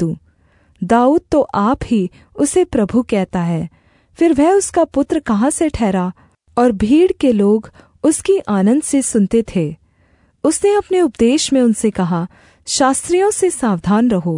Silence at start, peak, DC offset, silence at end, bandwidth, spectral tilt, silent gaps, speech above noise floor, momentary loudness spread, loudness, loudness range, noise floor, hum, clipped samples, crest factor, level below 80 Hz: 0 s; -2 dBFS; under 0.1%; 0 s; 11 kHz; -5.5 dB/octave; none; 41 dB; 8 LU; -15 LUFS; 2 LU; -55 dBFS; none; under 0.1%; 14 dB; -42 dBFS